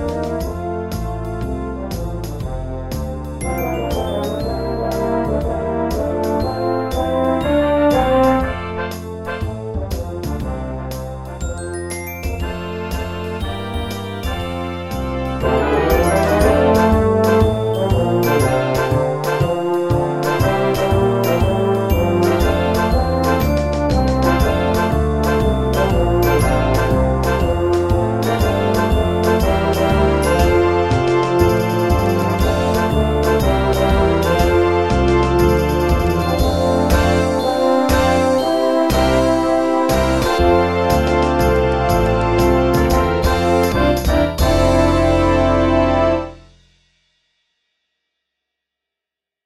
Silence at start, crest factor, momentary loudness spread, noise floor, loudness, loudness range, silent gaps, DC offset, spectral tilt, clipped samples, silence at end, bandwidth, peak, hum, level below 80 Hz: 0 s; 16 dB; 10 LU; -86 dBFS; -17 LUFS; 9 LU; none; under 0.1%; -6.5 dB/octave; under 0.1%; 3.05 s; 16 kHz; 0 dBFS; none; -26 dBFS